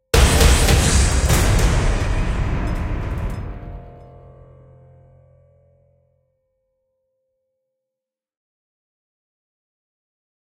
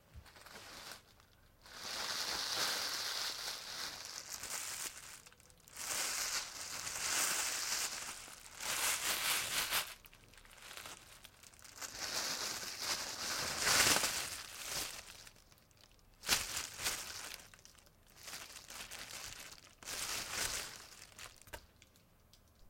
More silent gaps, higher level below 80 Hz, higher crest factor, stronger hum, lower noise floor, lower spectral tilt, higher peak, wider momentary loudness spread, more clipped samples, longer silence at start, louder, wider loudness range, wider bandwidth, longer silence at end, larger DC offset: neither; first, -24 dBFS vs -66 dBFS; second, 20 dB vs 28 dB; neither; first, -86 dBFS vs -67 dBFS; first, -4 dB/octave vs 0.5 dB/octave; first, 0 dBFS vs -14 dBFS; about the same, 18 LU vs 20 LU; neither; about the same, 0.15 s vs 0.1 s; first, -18 LUFS vs -37 LUFS; first, 20 LU vs 8 LU; about the same, 16 kHz vs 16.5 kHz; first, 6.55 s vs 0 s; neither